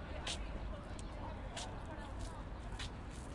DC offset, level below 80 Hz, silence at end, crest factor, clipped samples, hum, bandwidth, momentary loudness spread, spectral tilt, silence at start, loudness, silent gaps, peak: under 0.1%; -48 dBFS; 0 s; 16 dB; under 0.1%; none; 11.5 kHz; 5 LU; -4.5 dB/octave; 0 s; -46 LUFS; none; -28 dBFS